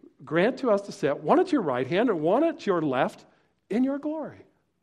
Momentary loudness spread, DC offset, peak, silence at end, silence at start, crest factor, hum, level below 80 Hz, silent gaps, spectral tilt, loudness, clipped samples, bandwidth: 8 LU; under 0.1%; -8 dBFS; 0.45 s; 0.2 s; 18 dB; none; -70 dBFS; none; -7 dB/octave; -26 LUFS; under 0.1%; 11.5 kHz